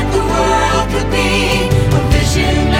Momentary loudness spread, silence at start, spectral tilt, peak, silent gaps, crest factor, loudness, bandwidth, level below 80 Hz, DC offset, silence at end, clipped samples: 2 LU; 0 s; -5 dB/octave; 0 dBFS; none; 12 dB; -13 LUFS; 16.5 kHz; -20 dBFS; under 0.1%; 0 s; under 0.1%